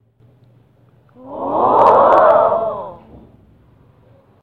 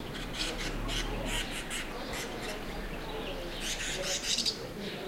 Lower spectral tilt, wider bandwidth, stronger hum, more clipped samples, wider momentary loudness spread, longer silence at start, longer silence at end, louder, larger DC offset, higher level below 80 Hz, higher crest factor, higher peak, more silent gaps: first, -7.5 dB/octave vs -2.5 dB/octave; second, 6.4 kHz vs 16 kHz; neither; neither; first, 20 LU vs 9 LU; first, 1.25 s vs 0 s; first, 1.5 s vs 0 s; first, -12 LUFS vs -34 LUFS; neither; second, -54 dBFS vs -42 dBFS; about the same, 16 dB vs 20 dB; first, 0 dBFS vs -16 dBFS; neither